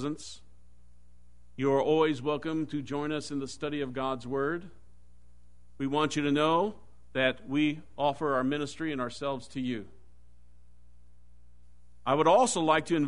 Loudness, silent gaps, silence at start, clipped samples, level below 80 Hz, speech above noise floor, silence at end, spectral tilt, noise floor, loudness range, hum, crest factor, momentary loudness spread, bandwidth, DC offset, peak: -30 LUFS; none; 0 s; under 0.1%; -60 dBFS; 31 dB; 0 s; -5 dB/octave; -60 dBFS; 6 LU; 60 Hz at -60 dBFS; 20 dB; 12 LU; 10.5 kHz; 0.5%; -10 dBFS